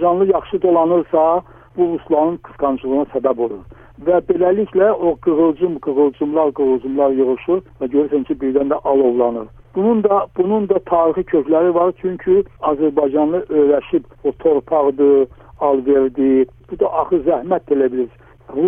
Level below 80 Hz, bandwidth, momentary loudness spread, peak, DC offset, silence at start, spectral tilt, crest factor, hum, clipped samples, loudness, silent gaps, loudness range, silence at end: -48 dBFS; 3.6 kHz; 6 LU; -2 dBFS; under 0.1%; 0 s; -10.5 dB/octave; 14 dB; none; under 0.1%; -17 LUFS; none; 2 LU; 0 s